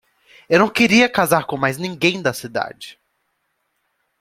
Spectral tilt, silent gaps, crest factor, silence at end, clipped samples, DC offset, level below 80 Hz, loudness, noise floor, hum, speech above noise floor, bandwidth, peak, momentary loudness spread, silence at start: -4.5 dB/octave; none; 18 dB; 1.3 s; under 0.1%; under 0.1%; -58 dBFS; -17 LUFS; -71 dBFS; none; 53 dB; 16 kHz; -2 dBFS; 14 LU; 0.5 s